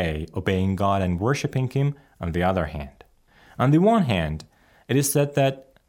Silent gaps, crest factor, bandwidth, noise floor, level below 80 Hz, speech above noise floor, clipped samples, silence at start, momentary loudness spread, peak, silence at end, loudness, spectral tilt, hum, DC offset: none; 16 dB; 17 kHz; -55 dBFS; -46 dBFS; 33 dB; under 0.1%; 0 s; 12 LU; -8 dBFS; 0.25 s; -23 LUFS; -6 dB/octave; none; under 0.1%